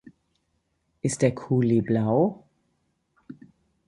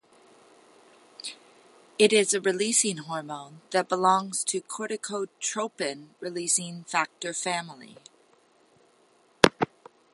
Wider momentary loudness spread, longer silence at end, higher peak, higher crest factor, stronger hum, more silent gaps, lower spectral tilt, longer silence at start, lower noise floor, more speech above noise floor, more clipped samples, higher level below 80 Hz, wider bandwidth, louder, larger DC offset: second, 6 LU vs 17 LU; about the same, 0.55 s vs 0.5 s; second, -6 dBFS vs 0 dBFS; second, 20 dB vs 28 dB; neither; neither; first, -7 dB/octave vs -2.5 dB/octave; second, 1.05 s vs 1.25 s; first, -73 dBFS vs -63 dBFS; first, 51 dB vs 35 dB; neither; about the same, -60 dBFS vs -60 dBFS; about the same, 11.5 kHz vs 11.5 kHz; about the same, -24 LUFS vs -26 LUFS; neither